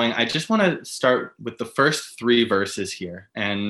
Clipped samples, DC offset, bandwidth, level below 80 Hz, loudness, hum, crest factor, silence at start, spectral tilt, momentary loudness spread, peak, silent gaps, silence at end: under 0.1%; under 0.1%; 12.5 kHz; -64 dBFS; -22 LUFS; none; 18 dB; 0 s; -4 dB/octave; 13 LU; -4 dBFS; none; 0 s